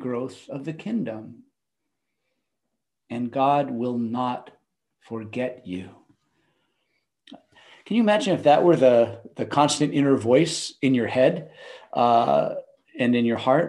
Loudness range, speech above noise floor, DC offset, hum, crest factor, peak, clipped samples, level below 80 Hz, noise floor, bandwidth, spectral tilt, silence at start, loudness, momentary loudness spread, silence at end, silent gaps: 14 LU; 61 dB; under 0.1%; none; 18 dB; -6 dBFS; under 0.1%; -70 dBFS; -83 dBFS; 11.5 kHz; -5.5 dB/octave; 0 s; -22 LUFS; 17 LU; 0 s; none